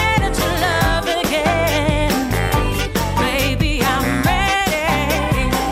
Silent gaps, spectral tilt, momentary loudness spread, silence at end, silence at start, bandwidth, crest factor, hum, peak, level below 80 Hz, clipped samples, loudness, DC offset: none; -4.5 dB/octave; 2 LU; 0 s; 0 s; 16 kHz; 12 dB; none; -4 dBFS; -26 dBFS; under 0.1%; -17 LUFS; under 0.1%